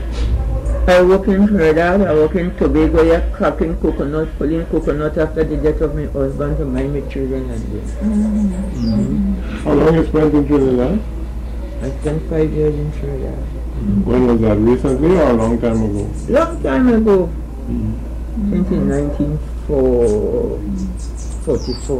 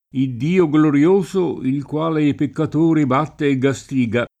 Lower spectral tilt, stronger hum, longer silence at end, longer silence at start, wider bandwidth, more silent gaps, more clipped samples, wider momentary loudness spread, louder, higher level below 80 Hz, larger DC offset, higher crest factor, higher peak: about the same, -8 dB/octave vs -7.5 dB/octave; neither; second, 0 s vs 0.15 s; second, 0 s vs 0.15 s; about the same, 11 kHz vs 10 kHz; neither; neither; first, 11 LU vs 7 LU; about the same, -16 LUFS vs -18 LUFS; first, -24 dBFS vs -54 dBFS; neither; about the same, 10 dB vs 14 dB; second, -6 dBFS vs -2 dBFS